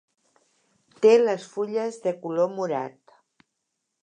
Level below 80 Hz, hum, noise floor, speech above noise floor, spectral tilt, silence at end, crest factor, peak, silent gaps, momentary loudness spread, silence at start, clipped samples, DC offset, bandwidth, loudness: -84 dBFS; none; -80 dBFS; 57 dB; -5.5 dB/octave; 1.15 s; 20 dB; -6 dBFS; none; 12 LU; 1 s; under 0.1%; under 0.1%; 9.4 kHz; -24 LUFS